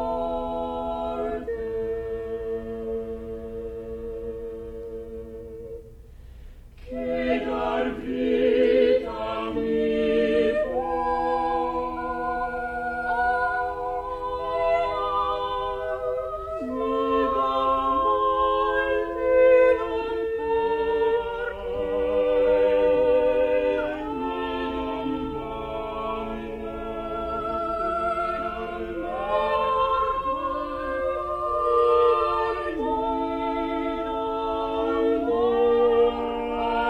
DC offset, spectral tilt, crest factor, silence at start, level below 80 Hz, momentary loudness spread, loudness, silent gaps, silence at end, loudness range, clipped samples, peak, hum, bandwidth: under 0.1%; -6.5 dB/octave; 16 dB; 0 s; -44 dBFS; 12 LU; -25 LUFS; none; 0 s; 10 LU; under 0.1%; -10 dBFS; none; 8.4 kHz